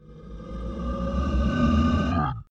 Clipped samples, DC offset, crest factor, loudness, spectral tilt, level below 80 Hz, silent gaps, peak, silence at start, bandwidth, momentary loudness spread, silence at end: under 0.1%; under 0.1%; 14 dB; -25 LUFS; -8 dB/octave; -30 dBFS; none; -10 dBFS; 0.05 s; 7.6 kHz; 17 LU; 0.1 s